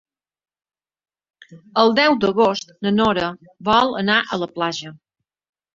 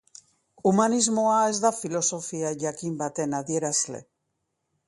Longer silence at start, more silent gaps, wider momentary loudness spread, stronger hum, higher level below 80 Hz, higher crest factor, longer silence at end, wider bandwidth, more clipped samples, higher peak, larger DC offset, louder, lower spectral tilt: first, 1.5 s vs 0.65 s; neither; about the same, 11 LU vs 9 LU; neither; first, -56 dBFS vs -70 dBFS; about the same, 20 dB vs 20 dB; about the same, 0.8 s vs 0.85 s; second, 7.6 kHz vs 11.5 kHz; neither; first, -2 dBFS vs -8 dBFS; neither; first, -18 LUFS vs -25 LUFS; about the same, -5 dB/octave vs -4 dB/octave